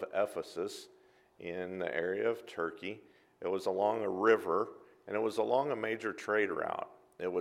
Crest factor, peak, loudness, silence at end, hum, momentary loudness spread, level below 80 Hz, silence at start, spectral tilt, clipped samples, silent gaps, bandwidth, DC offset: 22 dB; -14 dBFS; -35 LUFS; 0 s; none; 13 LU; -78 dBFS; 0 s; -5 dB/octave; under 0.1%; none; 14.5 kHz; under 0.1%